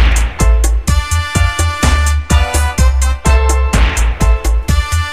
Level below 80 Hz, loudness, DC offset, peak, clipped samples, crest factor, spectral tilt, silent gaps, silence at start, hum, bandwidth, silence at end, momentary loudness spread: -12 dBFS; -13 LUFS; 2%; 0 dBFS; under 0.1%; 10 dB; -4.5 dB/octave; none; 0 s; none; 15.5 kHz; 0 s; 3 LU